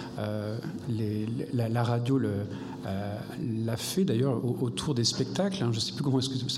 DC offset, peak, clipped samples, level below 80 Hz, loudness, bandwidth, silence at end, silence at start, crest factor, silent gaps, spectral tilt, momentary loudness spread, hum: under 0.1%; -14 dBFS; under 0.1%; -62 dBFS; -30 LUFS; 15 kHz; 0 s; 0 s; 16 dB; none; -5.5 dB/octave; 8 LU; none